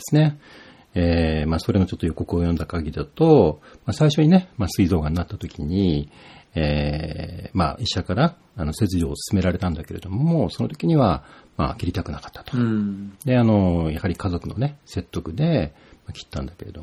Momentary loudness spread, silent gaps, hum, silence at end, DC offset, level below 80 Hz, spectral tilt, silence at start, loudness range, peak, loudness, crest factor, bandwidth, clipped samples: 14 LU; none; none; 0 s; under 0.1%; -36 dBFS; -7 dB/octave; 0 s; 5 LU; -2 dBFS; -22 LUFS; 20 dB; 14 kHz; under 0.1%